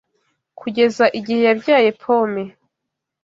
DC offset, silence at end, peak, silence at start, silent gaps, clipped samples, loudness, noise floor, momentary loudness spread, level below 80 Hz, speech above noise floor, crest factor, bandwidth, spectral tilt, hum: under 0.1%; 0.75 s; 0 dBFS; 0.6 s; none; under 0.1%; -17 LUFS; -80 dBFS; 13 LU; -66 dBFS; 64 dB; 18 dB; 7.6 kHz; -5.5 dB/octave; none